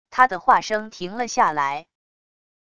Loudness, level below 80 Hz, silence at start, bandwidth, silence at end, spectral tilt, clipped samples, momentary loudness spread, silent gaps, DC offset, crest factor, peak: -20 LUFS; -60 dBFS; 0.1 s; 11 kHz; 0.8 s; -3 dB/octave; under 0.1%; 12 LU; none; under 0.1%; 22 dB; -2 dBFS